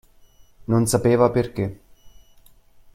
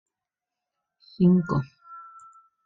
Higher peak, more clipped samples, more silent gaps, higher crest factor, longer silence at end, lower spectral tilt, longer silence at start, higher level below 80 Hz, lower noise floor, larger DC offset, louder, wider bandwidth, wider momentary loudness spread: first, -4 dBFS vs -10 dBFS; neither; neither; about the same, 20 dB vs 18 dB; first, 0.85 s vs 0.65 s; second, -6.5 dB/octave vs -10 dB/octave; second, 0.7 s vs 1.2 s; first, -48 dBFS vs -60 dBFS; second, -51 dBFS vs -88 dBFS; neither; first, -20 LUFS vs -23 LUFS; first, 15.5 kHz vs 5.2 kHz; second, 12 LU vs 24 LU